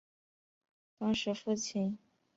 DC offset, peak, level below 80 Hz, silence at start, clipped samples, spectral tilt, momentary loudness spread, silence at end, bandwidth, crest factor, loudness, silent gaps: under 0.1%; -22 dBFS; -70 dBFS; 1 s; under 0.1%; -4.5 dB/octave; 5 LU; 0.4 s; 8 kHz; 16 dB; -35 LUFS; none